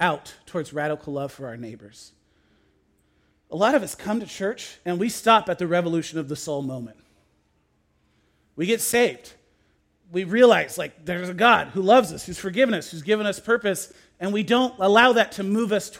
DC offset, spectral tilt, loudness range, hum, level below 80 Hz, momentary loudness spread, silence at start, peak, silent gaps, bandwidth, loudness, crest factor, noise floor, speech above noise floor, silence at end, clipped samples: under 0.1%; -4 dB/octave; 9 LU; none; -62 dBFS; 16 LU; 0 s; -2 dBFS; none; 16.5 kHz; -22 LUFS; 22 dB; -67 dBFS; 44 dB; 0 s; under 0.1%